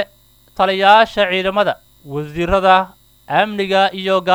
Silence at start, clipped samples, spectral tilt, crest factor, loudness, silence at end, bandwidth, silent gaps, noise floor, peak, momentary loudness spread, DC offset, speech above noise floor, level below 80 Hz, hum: 0 s; under 0.1%; -5 dB/octave; 16 dB; -15 LUFS; 0 s; over 20 kHz; none; -50 dBFS; 0 dBFS; 17 LU; under 0.1%; 36 dB; -40 dBFS; none